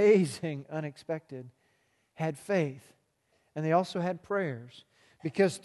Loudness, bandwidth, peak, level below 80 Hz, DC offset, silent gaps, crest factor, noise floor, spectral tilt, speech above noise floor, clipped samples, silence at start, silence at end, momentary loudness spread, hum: -32 LUFS; 12.5 kHz; -12 dBFS; -76 dBFS; under 0.1%; none; 20 dB; -73 dBFS; -6.5 dB/octave; 43 dB; under 0.1%; 0 s; 0.05 s; 18 LU; none